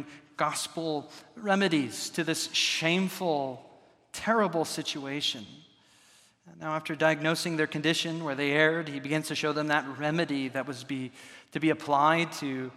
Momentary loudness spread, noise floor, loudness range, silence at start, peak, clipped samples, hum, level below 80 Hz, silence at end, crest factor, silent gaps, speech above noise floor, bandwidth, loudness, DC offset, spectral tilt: 12 LU; -61 dBFS; 4 LU; 0 s; -8 dBFS; under 0.1%; none; -76 dBFS; 0 s; 22 dB; none; 32 dB; 15.5 kHz; -29 LUFS; under 0.1%; -4 dB/octave